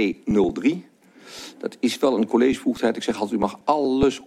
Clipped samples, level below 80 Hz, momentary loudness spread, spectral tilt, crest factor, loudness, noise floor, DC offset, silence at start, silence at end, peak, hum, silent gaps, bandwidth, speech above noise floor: under 0.1%; -50 dBFS; 14 LU; -5.5 dB/octave; 18 dB; -22 LUFS; -44 dBFS; under 0.1%; 0 s; 0 s; -4 dBFS; none; none; 14.5 kHz; 23 dB